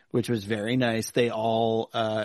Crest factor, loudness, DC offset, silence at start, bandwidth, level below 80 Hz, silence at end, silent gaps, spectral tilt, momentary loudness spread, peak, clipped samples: 16 dB; -26 LUFS; under 0.1%; 0.15 s; 12.5 kHz; -64 dBFS; 0 s; none; -5.5 dB/octave; 3 LU; -10 dBFS; under 0.1%